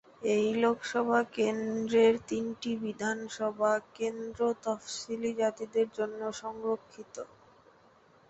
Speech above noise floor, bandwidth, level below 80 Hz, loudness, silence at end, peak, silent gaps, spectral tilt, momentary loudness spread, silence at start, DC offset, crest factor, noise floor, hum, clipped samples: 31 dB; 8.2 kHz; -70 dBFS; -31 LUFS; 1.05 s; -14 dBFS; none; -4.5 dB/octave; 11 LU; 0.2 s; under 0.1%; 18 dB; -62 dBFS; none; under 0.1%